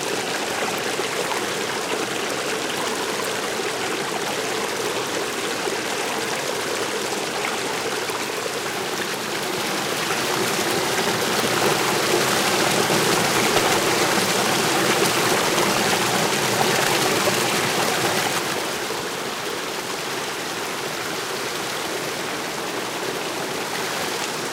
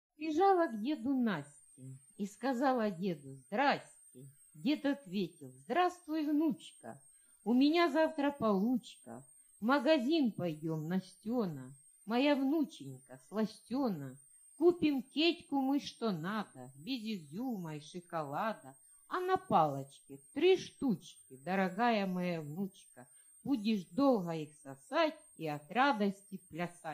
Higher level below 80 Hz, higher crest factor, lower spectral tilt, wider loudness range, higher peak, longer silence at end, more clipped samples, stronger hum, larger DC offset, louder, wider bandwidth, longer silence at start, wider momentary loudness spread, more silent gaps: first, -62 dBFS vs -78 dBFS; about the same, 18 dB vs 18 dB; second, -2 dB/octave vs -6 dB/octave; first, 7 LU vs 4 LU; first, -4 dBFS vs -16 dBFS; about the same, 0 s vs 0 s; neither; neither; neither; first, -22 LUFS vs -35 LUFS; first, 17.5 kHz vs 15.5 kHz; second, 0 s vs 0.2 s; second, 7 LU vs 19 LU; neither